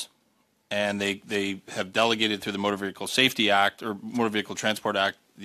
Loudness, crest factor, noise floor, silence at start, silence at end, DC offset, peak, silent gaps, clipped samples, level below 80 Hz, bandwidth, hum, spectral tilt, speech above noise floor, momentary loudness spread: -26 LUFS; 22 dB; -68 dBFS; 0 s; 0 s; under 0.1%; -4 dBFS; none; under 0.1%; -68 dBFS; 15 kHz; none; -3 dB/octave; 42 dB; 10 LU